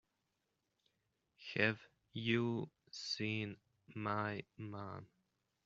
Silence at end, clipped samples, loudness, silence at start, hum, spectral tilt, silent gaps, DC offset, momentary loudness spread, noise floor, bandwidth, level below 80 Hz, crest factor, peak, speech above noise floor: 0.6 s; under 0.1%; -41 LUFS; 1.4 s; none; -4 dB/octave; none; under 0.1%; 16 LU; -86 dBFS; 7.4 kHz; -80 dBFS; 26 dB; -16 dBFS; 45 dB